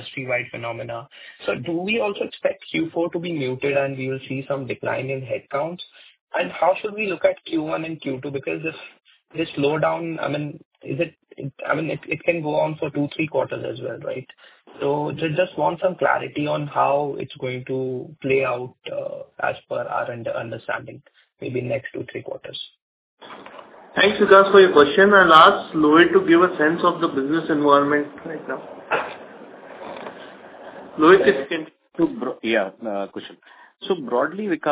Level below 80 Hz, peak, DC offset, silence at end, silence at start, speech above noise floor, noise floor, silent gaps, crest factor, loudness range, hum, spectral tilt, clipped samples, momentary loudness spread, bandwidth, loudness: -62 dBFS; 0 dBFS; under 0.1%; 0 s; 0 s; 20 dB; -41 dBFS; 6.21-6.27 s, 10.65-10.71 s, 22.82-23.17 s; 22 dB; 12 LU; none; -9.5 dB/octave; under 0.1%; 20 LU; 4 kHz; -21 LUFS